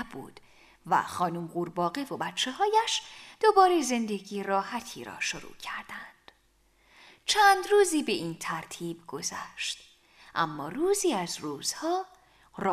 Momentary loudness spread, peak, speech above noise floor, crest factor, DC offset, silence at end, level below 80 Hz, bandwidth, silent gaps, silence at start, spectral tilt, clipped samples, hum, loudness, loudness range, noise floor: 16 LU; -8 dBFS; 38 dB; 22 dB; under 0.1%; 0 s; -66 dBFS; 15.5 kHz; none; 0 s; -3 dB/octave; under 0.1%; none; -28 LUFS; 5 LU; -66 dBFS